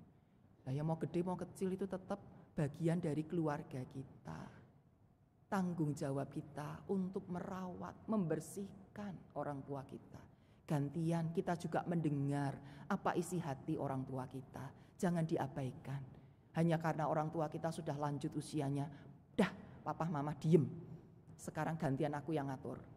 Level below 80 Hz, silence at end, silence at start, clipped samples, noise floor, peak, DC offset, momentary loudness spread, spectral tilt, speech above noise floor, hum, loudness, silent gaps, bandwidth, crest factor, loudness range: -70 dBFS; 0 s; 0 s; under 0.1%; -70 dBFS; -18 dBFS; under 0.1%; 14 LU; -7.5 dB/octave; 30 dB; none; -41 LUFS; none; 14 kHz; 24 dB; 4 LU